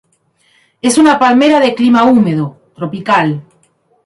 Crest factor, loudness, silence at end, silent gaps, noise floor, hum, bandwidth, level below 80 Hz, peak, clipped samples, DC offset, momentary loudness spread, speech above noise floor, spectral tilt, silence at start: 12 dB; -10 LUFS; 0.65 s; none; -56 dBFS; none; 11.5 kHz; -54 dBFS; 0 dBFS; under 0.1%; under 0.1%; 15 LU; 46 dB; -5 dB/octave; 0.85 s